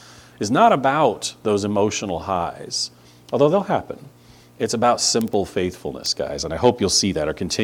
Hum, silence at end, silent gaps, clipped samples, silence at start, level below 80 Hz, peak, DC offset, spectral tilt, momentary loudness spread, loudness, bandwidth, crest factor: none; 0 s; none; under 0.1%; 0 s; -50 dBFS; -2 dBFS; under 0.1%; -4 dB/octave; 10 LU; -20 LUFS; 19 kHz; 20 dB